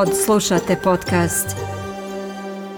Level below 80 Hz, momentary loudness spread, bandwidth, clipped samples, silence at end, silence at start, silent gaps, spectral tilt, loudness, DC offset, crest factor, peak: -46 dBFS; 13 LU; 19 kHz; under 0.1%; 0 s; 0 s; none; -4.5 dB/octave; -20 LUFS; under 0.1%; 14 dB; -6 dBFS